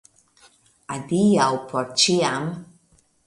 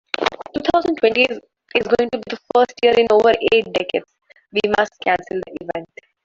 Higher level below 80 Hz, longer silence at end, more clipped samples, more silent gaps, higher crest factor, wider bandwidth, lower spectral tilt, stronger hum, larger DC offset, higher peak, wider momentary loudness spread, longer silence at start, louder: second, -62 dBFS vs -54 dBFS; first, 0.65 s vs 0.4 s; neither; neither; about the same, 18 dB vs 16 dB; first, 11.5 kHz vs 7.6 kHz; about the same, -4 dB/octave vs -4.5 dB/octave; neither; neither; second, -6 dBFS vs -2 dBFS; first, 16 LU vs 13 LU; first, 0.9 s vs 0.2 s; second, -21 LUFS vs -18 LUFS